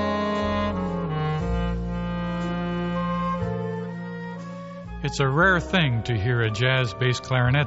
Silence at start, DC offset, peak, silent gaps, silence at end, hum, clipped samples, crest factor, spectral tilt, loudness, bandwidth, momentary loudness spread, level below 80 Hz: 0 s; under 0.1%; -6 dBFS; none; 0 s; none; under 0.1%; 18 dB; -5 dB/octave; -25 LUFS; 8 kHz; 13 LU; -38 dBFS